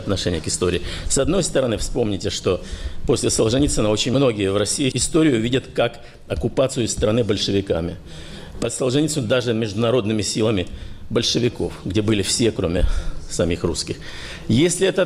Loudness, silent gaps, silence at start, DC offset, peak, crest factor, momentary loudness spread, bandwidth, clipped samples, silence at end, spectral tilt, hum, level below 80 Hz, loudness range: -20 LUFS; none; 0 s; under 0.1%; -8 dBFS; 14 dB; 11 LU; 15 kHz; under 0.1%; 0 s; -4.5 dB/octave; none; -32 dBFS; 3 LU